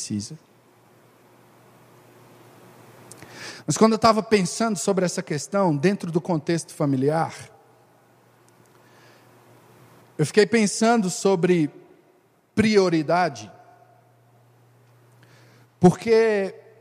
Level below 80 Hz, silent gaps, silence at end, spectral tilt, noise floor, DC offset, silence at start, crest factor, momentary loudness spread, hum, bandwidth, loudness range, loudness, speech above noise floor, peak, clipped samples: -62 dBFS; none; 0.25 s; -5.5 dB/octave; -60 dBFS; under 0.1%; 0 s; 22 dB; 16 LU; none; 15.5 kHz; 7 LU; -21 LUFS; 39 dB; -2 dBFS; under 0.1%